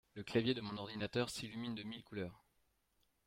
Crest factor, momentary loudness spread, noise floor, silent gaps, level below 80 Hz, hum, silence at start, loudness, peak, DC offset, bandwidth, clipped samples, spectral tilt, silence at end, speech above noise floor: 20 dB; 10 LU; -80 dBFS; none; -72 dBFS; none; 0.15 s; -42 LUFS; -22 dBFS; under 0.1%; 16.5 kHz; under 0.1%; -5 dB/octave; 0.9 s; 38 dB